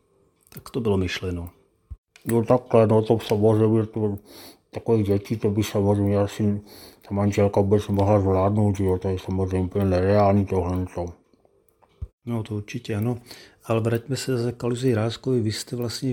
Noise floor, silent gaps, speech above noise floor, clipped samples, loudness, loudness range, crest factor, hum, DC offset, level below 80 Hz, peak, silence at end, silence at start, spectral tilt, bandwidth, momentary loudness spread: -62 dBFS; 1.98-2.04 s, 12.13-12.18 s; 40 dB; under 0.1%; -23 LUFS; 7 LU; 20 dB; none; under 0.1%; -50 dBFS; -4 dBFS; 0 s; 0.55 s; -7 dB/octave; 17 kHz; 14 LU